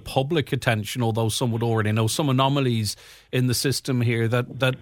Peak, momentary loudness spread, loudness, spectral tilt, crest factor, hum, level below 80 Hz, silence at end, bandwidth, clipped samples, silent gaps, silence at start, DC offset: -6 dBFS; 4 LU; -23 LUFS; -5 dB/octave; 18 dB; none; -54 dBFS; 0 s; 18 kHz; under 0.1%; none; 0.05 s; under 0.1%